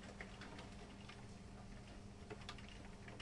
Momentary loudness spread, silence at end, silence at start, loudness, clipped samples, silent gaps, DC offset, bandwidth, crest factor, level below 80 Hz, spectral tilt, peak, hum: 4 LU; 0 s; 0 s; -55 LUFS; under 0.1%; none; under 0.1%; 11 kHz; 20 dB; -62 dBFS; -5 dB/octave; -34 dBFS; none